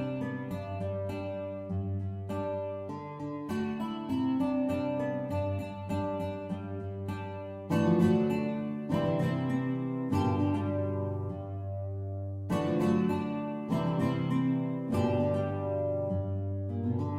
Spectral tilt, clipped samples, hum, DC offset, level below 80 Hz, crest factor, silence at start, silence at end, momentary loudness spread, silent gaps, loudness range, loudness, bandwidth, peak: -8.5 dB/octave; under 0.1%; none; under 0.1%; -62 dBFS; 16 dB; 0 s; 0 s; 9 LU; none; 5 LU; -32 LUFS; 13 kHz; -14 dBFS